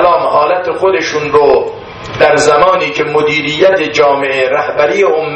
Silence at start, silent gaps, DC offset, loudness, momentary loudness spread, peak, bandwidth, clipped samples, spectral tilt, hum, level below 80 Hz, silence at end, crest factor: 0 s; none; under 0.1%; -10 LUFS; 5 LU; 0 dBFS; 9.2 kHz; 0.2%; -4 dB/octave; none; -44 dBFS; 0 s; 10 dB